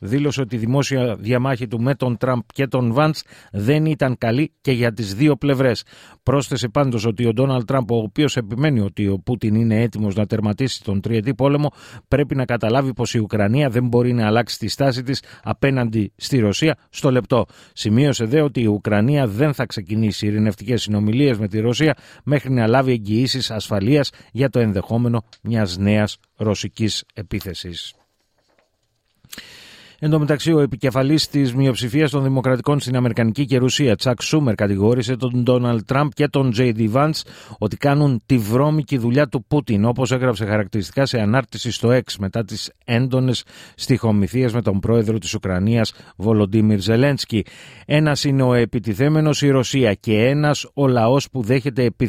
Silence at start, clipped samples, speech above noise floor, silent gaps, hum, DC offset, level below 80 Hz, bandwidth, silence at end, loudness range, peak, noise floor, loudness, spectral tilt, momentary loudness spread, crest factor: 0 s; under 0.1%; 49 dB; none; none; under 0.1%; -48 dBFS; 15.5 kHz; 0 s; 3 LU; -2 dBFS; -67 dBFS; -19 LUFS; -6.5 dB/octave; 7 LU; 16 dB